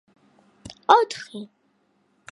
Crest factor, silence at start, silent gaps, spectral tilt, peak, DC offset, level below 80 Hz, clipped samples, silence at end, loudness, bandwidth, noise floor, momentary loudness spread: 26 dB; 0.9 s; none; -3 dB/octave; 0 dBFS; under 0.1%; -66 dBFS; under 0.1%; 0.9 s; -21 LUFS; 11.5 kHz; -67 dBFS; 26 LU